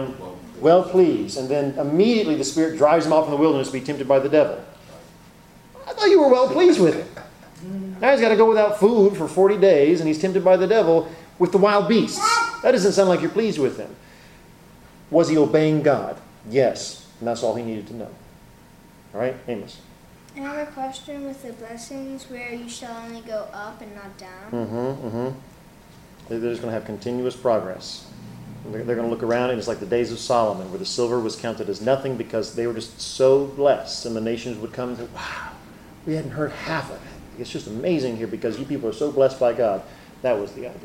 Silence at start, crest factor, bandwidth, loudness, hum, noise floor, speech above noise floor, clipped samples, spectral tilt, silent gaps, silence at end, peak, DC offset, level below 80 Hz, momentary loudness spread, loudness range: 0 s; 18 dB; 16 kHz; -21 LUFS; none; -48 dBFS; 28 dB; under 0.1%; -5.5 dB/octave; none; 0 s; -2 dBFS; under 0.1%; -54 dBFS; 19 LU; 15 LU